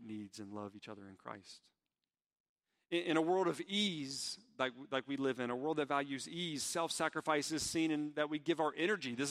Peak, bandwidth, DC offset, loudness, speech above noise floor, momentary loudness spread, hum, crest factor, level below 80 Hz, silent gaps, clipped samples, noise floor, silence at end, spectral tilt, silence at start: -18 dBFS; 15.5 kHz; under 0.1%; -37 LUFS; over 52 dB; 14 LU; none; 22 dB; -76 dBFS; 2.26-2.30 s, 2.40-2.56 s; under 0.1%; under -90 dBFS; 0 s; -3.5 dB/octave; 0 s